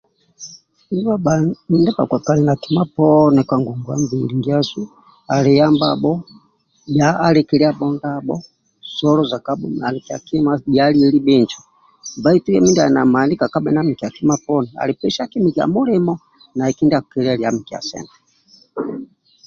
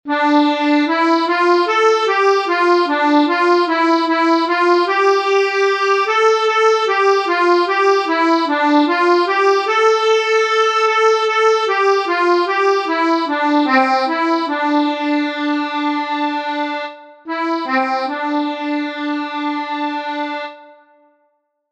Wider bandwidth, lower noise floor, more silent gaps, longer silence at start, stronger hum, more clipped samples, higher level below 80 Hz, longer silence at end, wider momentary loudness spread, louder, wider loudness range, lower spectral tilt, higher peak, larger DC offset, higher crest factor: second, 7.2 kHz vs 9 kHz; second, -52 dBFS vs -65 dBFS; neither; first, 0.4 s vs 0.05 s; neither; neither; first, -52 dBFS vs -78 dBFS; second, 0.4 s vs 1.1 s; first, 15 LU vs 8 LU; about the same, -17 LUFS vs -15 LUFS; about the same, 4 LU vs 6 LU; first, -6.5 dB/octave vs -1.5 dB/octave; about the same, -2 dBFS vs -2 dBFS; neither; about the same, 16 dB vs 14 dB